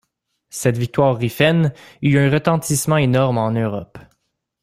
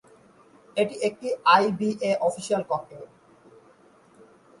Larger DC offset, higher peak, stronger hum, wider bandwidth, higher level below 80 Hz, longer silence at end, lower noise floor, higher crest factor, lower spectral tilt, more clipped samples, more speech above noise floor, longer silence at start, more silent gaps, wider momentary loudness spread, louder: neither; first, -2 dBFS vs -6 dBFS; neither; first, 16 kHz vs 11.5 kHz; first, -50 dBFS vs -70 dBFS; second, 0.6 s vs 1.55 s; first, -71 dBFS vs -56 dBFS; second, 16 dB vs 22 dB; about the same, -5.5 dB/octave vs -4.5 dB/octave; neither; first, 54 dB vs 32 dB; second, 0.55 s vs 0.75 s; neither; second, 7 LU vs 13 LU; first, -18 LUFS vs -24 LUFS